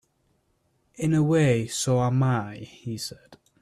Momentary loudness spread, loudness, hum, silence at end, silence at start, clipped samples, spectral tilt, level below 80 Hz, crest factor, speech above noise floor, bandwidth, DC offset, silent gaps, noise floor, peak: 15 LU; -24 LUFS; none; 0.25 s; 1 s; under 0.1%; -6 dB/octave; -56 dBFS; 16 dB; 46 dB; 13.5 kHz; under 0.1%; none; -70 dBFS; -10 dBFS